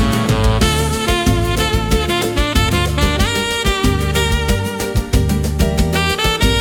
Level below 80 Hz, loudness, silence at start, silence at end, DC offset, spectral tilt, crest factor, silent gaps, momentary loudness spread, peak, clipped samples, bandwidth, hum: -20 dBFS; -16 LUFS; 0 s; 0 s; under 0.1%; -4.5 dB/octave; 14 dB; none; 2 LU; 0 dBFS; under 0.1%; 18 kHz; none